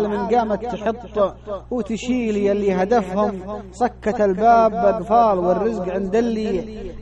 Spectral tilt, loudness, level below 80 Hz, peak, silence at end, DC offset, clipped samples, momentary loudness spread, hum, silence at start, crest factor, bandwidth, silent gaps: -7 dB/octave; -20 LUFS; -42 dBFS; -4 dBFS; 0 s; under 0.1%; under 0.1%; 11 LU; none; 0 s; 16 dB; 8.8 kHz; none